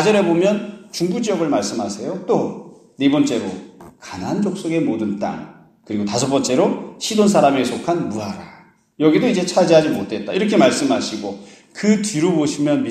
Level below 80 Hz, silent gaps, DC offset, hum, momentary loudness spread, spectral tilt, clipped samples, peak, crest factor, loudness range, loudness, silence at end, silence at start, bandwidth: -60 dBFS; none; under 0.1%; none; 15 LU; -5 dB/octave; under 0.1%; 0 dBFS; 18 dB; 5 LU; -18 LUFS; 0 s; 0 s; 14 kHz